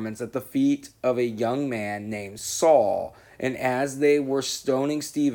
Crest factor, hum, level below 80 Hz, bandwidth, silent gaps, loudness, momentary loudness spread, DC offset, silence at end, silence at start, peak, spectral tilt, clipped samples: 18 dB; none; -64 dBFS; 19 kHz; none; -25 LUFS; 11 LU; under 0.1%; 0 s; 0 s; -6 dBFS; -4.5 dB/octave; under 0.1%